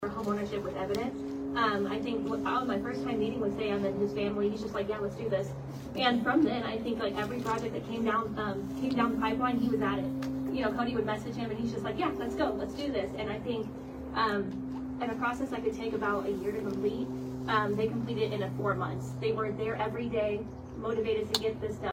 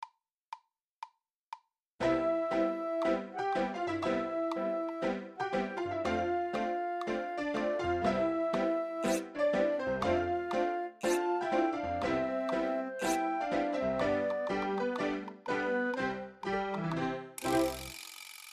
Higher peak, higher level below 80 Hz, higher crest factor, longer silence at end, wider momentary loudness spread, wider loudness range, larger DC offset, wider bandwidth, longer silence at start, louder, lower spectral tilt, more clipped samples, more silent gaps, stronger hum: first, -10 dBFS vs -18 dBFS; first, -54 dBFS vs -60 dBFS; first, 22 dB vs 16 dB; about the same, 0 s vs 0 s; about the same, 7 LU vs 9 LU; about the same, 2 LU vs 3 LU; neither; about the same, 16 kHz vs 15.5 kHz; about the same, 0 s vs 0 s; about the same, -32 LUFS vs -33 LUFS; about the same, -6 dB/octave vs -5 dB/octave; neither; second, none vs 0.32-0.50 s, 0.82-1.02 s, 1.36-1.52 s, 1.88-1.98 s; neither